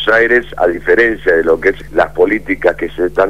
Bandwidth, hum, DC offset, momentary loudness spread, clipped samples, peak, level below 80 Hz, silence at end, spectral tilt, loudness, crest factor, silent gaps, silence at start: 12.5 kHz; none; 2%; 5 LU; under 0.1%; 0 dBFS; -36 dBFS; 0 s; -6 dB/octave; -13 LUFS; 12 dB; none; 0 s